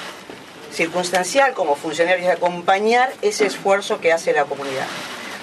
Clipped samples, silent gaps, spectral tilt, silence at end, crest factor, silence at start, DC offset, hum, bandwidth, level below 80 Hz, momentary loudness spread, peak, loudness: under 0.1%; none; -3 dB/octave; 0 s; 20 dB; 0 s; under 0.1%; none; 13.5 kHz; -68 dBFS; 13 LU; 0 dBFS; -19 LUFS